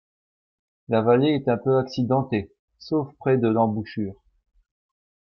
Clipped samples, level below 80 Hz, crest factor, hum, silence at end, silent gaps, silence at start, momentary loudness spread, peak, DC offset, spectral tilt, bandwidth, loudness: under 0.1%; -62 dBFS; 18 dB; none; 1.2 s; 2.59-2.68 s; 0.9 s; 11 LU; -8 dBFS; under 0.1%; -8.5 dB/octave; 6.4 kHz; -23 LUFS